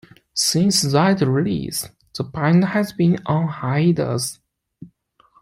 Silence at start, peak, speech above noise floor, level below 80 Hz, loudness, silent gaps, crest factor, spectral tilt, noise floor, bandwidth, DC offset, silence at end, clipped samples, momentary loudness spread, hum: 0.35 s; -4 dBFS; 39 dB; -54 dBFS; -19 LUFS; none; 16 dB; -5 dB/octave; -57 dBFS; 16 kHz; under 0.1%; 0.55 s; under 0.1%; 11 LU; none